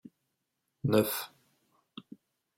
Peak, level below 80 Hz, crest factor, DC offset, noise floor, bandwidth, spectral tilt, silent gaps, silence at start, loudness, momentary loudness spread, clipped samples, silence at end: -12 dBFS; -74 dBFS; 24 dB; under 0.1%; -83 dBFS; 16.5 kHz; -5.5 dB/octave; none; 0.85 s; -30 LUFS; 24 LU; under 0.1%; 1.3 s